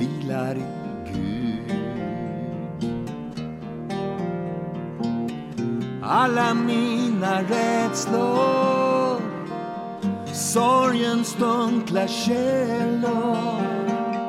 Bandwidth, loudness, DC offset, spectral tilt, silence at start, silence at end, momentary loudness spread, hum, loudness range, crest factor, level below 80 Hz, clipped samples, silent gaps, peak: 15.5 kHz; -24 LUFS; under 0.1%; -5 dB/octave; 0 s; 0 s; 11 LU; none; 8 LU; 14 dB; -56 dBFS; under 0.1%; none; -8 dBFS